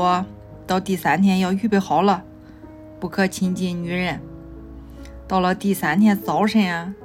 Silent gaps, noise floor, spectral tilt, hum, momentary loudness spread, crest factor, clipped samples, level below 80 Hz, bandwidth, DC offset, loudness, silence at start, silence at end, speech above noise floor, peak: none; -41 dBFS; -6 dB/octave; none; 22 LU; 16 dB; under 0.1%; -46 dBFS; 16 kHz; under 0.1%; -20 LUFS; 0 s; 0 s; 22 dB; -6 dBFS